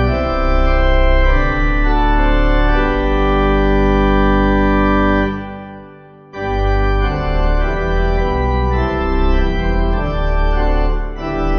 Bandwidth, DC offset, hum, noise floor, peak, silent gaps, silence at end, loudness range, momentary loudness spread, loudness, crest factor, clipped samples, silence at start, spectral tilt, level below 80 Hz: 6.2 kHz; under 0.1%; none; -39 dBFS; -2 dBFS; none; 0 s; 4 LU; 7 LU; -16 LUFS; 12 dB; under 0.1%; 0 s; -8 dB/octave; -16 dBFS